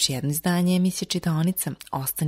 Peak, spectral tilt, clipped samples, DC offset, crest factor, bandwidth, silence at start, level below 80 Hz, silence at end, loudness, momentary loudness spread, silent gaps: -8 dBFS; -4.5 dB/octave; under 0.1%; under 0.1%; 16 dB; 16 kHz; 0 s; -56 dBFS; 0 s; -24 LUFS; 7 LU; none